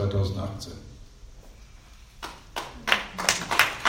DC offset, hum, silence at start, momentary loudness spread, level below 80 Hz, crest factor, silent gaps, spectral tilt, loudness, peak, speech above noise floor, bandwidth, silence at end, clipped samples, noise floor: under 0.1%; none; 0 s; 19 LU; -46 dBFS; 28 dB; none; -3 dB/octave; -26 LUFS; 0 dBFS; 21 dB; 16.5 kHz; 0 s; under 0.1%; -49 dBFS